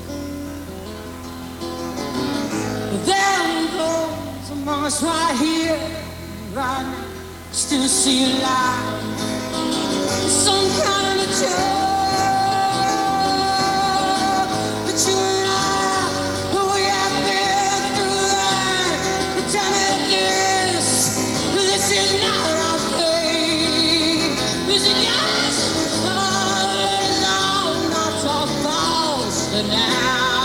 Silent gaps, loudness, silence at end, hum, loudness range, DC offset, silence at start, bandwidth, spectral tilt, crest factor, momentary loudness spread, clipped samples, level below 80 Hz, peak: none; -18 LUFS; 0 s; none; 5 LU; under 0.1%; 0 s; over 20 kHz; -2.5 dB/octave; 16 dB; 11 LU; under 0.1%; -46 dBFS; -4 dBFS